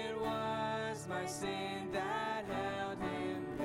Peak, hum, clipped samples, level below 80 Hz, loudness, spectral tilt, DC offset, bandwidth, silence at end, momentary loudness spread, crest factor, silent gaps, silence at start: -26 dBFS; none; under 0.1%; -64 dBFS; -39 LUFS; -4.5 dB/octave; under 0.1%; 16.5 kHz; 0 s; 3 LU; 12 dB; none; 0 s